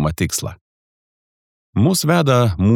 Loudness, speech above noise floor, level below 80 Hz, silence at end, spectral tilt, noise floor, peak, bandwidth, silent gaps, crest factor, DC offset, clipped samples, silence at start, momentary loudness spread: -17 LUFS; over 74 dB; -40 dBFS; 0 s; -5.5 dB/octave; under -90 dBFS; -2 dBFS; 19 kHz; 0.61-1.73 s; 16 dB; under 0.1%; under 0.1%; 0 s; 11 LU